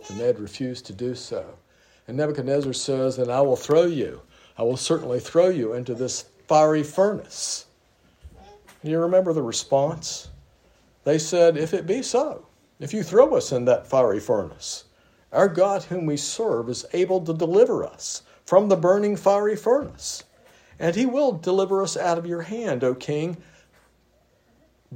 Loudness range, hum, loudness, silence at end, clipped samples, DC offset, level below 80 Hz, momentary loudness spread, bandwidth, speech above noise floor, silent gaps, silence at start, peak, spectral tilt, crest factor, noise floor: 4 LU; none; -23 LUFS; 0 s; under 0.1%; under 0.1%; -60 dBFS; 13 LU; 16 kHz; 40 dB; none; 0 s; -2 dBFS; -5 dB/octave; 20 dB; -62 dBFS